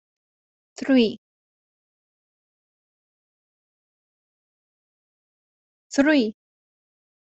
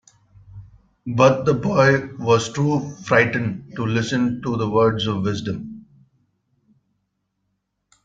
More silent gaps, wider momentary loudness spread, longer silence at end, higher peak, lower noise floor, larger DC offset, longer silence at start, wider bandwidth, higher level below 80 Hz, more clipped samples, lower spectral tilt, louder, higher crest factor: first, 1.18-5.90 s vs none; about the same, 13 LU vs 11 LU; second, 0.95 s vs 2.25 s; second, -6 dBFS vs -2 dBFS; first, under -90 dBFS vs -74 dBFS; neither; first, 0.8 s vs 0.55 s; about the same, 8.2 kHz vs 7.8 kHz; second, -68 dBFS vs -54 dBFS; neither; second, -4.5 dB/octave vs -6 dB/octave; about the same, -21 LUFS vs -20 LUFS; about the same, 22 dB vs 20 dB